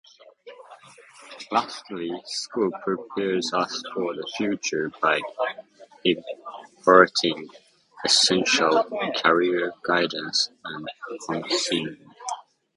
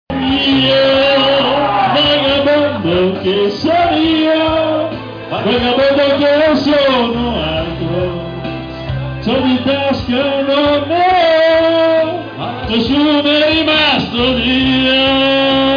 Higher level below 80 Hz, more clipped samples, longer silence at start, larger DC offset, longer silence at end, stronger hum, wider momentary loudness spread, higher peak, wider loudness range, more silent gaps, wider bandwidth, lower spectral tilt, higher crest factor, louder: second, -68 dBFS vs -36 dBFS; neither; first, 0.45 s vs 0.1 s; neither; first, 0.35 s vs 0 s; neither; first, 18 LU vs 9 LU; first, 0 dBFS vs -4 dBFS; first, 7 LU vs 4 LU; neither; first, 11.5 kHz vs 5.4 kHz; second, -2.5 dB/octave vs -6.5 dB/octave; first, 24 dB vs 8 dB; second, -23 LUFS vs -12 LUFS